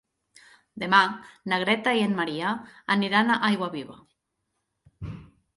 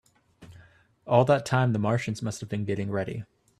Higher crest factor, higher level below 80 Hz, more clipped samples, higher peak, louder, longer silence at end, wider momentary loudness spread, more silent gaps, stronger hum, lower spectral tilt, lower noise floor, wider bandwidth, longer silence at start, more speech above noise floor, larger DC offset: about the same, 22 dB vs 22 dB; about the same, -58 dBFS vs -62 dBFS; neither; about the same, -4 dBFS vs -4 dBFS; about the same, -24 LUFS vs -26 LUFS; about the same, 0.3 s vs 0.35 s; first, 20 LU vs 11 LU; neither; neither; second, -5 dB/octave vs -6.5 dB/octave; first, -79 dBFS vs -56 dBFS; about the same, 11.5 kHz vs 12.5 kHz; first, 0.75 s vs 0.4 s; first, 54 dB vs 31 dB; neither